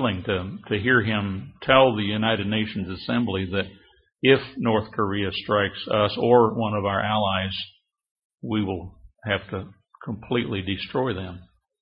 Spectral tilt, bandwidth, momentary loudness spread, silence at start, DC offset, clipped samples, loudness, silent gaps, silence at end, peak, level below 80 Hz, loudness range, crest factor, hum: -10 dB/octave; 5.4 kHz; 16 LU; 0 s; under 0.1%; under 0.1%; -24 LUFS; 8.11-8.15 s, 8.25-8.30 s; 0.35 s; -2 dBFS; -54 dBFS; 7 LU; 22 dB; none